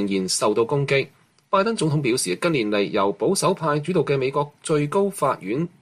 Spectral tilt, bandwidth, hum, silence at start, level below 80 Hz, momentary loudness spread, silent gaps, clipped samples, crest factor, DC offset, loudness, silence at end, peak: -5 dB/octave; 15 kHz; none; 0 s; -62 dBFS; 4 LU; none; under 0.1%; 14 dB; under 0.1%; -22 LUFS; 0.15 s; -6 dBFS